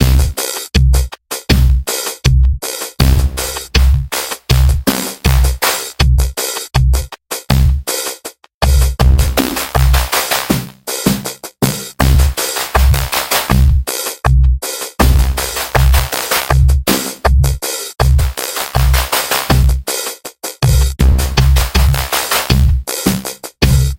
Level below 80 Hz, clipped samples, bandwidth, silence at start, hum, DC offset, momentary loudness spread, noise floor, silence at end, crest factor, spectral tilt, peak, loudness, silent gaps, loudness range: -14 dBFS; under 0.1%; 17 kHz; 0 s; none; under 0.1%; 7 LU; -33 dBFS; 0 s; 12 dB; -4.5 dB/octave; 0 dBFS; -14 LUFS; 8.54-8.61 s; 1 LU